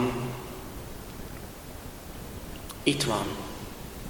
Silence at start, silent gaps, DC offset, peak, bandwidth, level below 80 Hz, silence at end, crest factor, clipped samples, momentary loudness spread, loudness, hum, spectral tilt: 0 s; none; under 0.1%; -8 dBFS; 19 kHz; -46 dBFS; 0 s; 26 dB; under 0.1%; 15 LU; -34 LUFS; none; -4.5 dB/octave